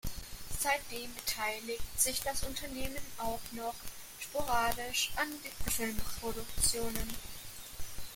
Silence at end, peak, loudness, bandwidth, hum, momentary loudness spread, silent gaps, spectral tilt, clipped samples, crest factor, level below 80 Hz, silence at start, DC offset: 0 s; -10 dBFS; -36 LUFS; 17 kHz; none; 15 LU; none; -2 dB/octave; under 0.1%; 24 dB; -46 dBFS; 0.05 s; under 0.1%